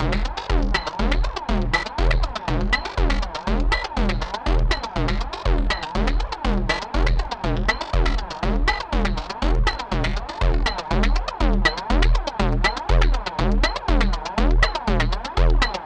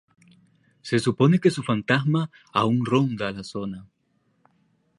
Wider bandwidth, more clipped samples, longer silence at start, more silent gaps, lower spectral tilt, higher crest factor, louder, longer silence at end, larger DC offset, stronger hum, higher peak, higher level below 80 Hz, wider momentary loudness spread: second, 8.6 kHz vs 11.5 kHz; neither; second, 0 s vs 0.85 s; neither; about the same, -5.5 dB/octave vs -6.5 dB/octave; second, 16 dB vs 22 dB; about the same, -23 LUFS vs -23 LUFS; second, 0 s vs 1.15 s; neither; neither; about the same, -4 dBFS vs -4 dBFS; first, -22 dBFS vs -62 dBFS; second, 4 LU vs 13 LU